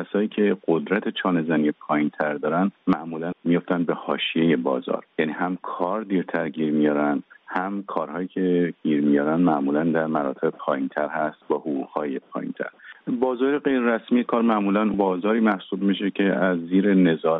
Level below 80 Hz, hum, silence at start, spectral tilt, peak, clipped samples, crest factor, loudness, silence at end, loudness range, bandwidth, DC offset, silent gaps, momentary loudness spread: -68 dBFS; none; 0 s; -5 dB/octave; -6 dBFS; under 0.1%; 16 dB; -23 LUFS; 0 s; 4 LU; 4 kHz; under 0.1%; none; 8 LU